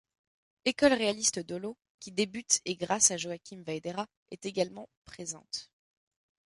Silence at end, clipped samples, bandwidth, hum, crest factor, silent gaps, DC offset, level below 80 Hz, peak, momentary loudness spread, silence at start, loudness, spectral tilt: 0.95 s; under 0.1%; 11.5 kHz; none; 26 dB; 1.89-1.98 s, 4.17-4.26 s, 4.97-5.02 s; under 0.1%; -68 dBFS; -8 dBFS; 17 LU; 0.65 s; -30 LUFS; -2 dB/octave